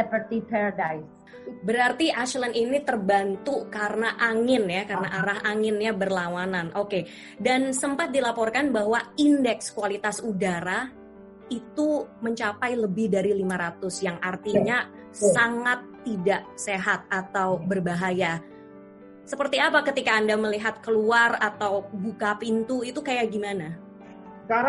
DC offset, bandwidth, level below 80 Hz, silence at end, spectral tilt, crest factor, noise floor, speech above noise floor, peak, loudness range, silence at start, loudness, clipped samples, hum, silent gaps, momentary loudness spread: under 0.1%; 11.5 kHz; -64 dBFS; 0 s; -4.5 dB/octave; 20 dB; -47 dBFS; 21 dB; -6 dBFS; 4 LU; 0 s; -25 LUFS; under 0.1%; none; none; 10 LU